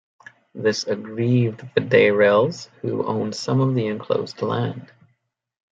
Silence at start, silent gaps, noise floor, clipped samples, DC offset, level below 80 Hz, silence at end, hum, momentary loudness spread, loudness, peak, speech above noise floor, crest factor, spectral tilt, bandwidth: 0.55 s; none; -69 dBFS; under 0.1%; under 0.1%; -66 dBFS; 0.85 s; none; 11 LU; -21 LUFS; -2 dBFS; 49 dB; 18 dB; -6.5 dB/octave; 7.8 kHz